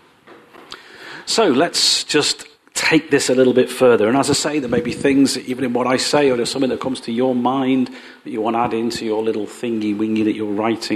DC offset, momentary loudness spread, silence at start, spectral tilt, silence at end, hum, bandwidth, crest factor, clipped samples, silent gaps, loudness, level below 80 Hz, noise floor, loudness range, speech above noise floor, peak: under 0.1%; 12 LU; 0.3 s; -3.5 dB/octave; 0 s; none; 13.5 kHz; 16 dB; under 0.1%; none; -17 LUFS; -58 dBFS; -46 dBFS; 5 LU; 29 dB; -2 dBFS